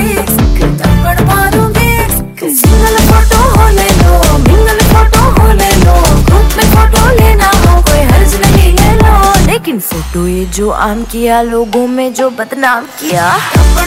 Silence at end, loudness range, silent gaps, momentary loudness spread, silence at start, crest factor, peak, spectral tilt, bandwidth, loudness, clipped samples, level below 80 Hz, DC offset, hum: 0 s; 5 LU; none; 7 LU; 0 s; 6 dB; 0 dBFS; -5 dB/octave; 16.5 kHz; -8 LUFS; 6%; -10 dBFS; under 0.1%; none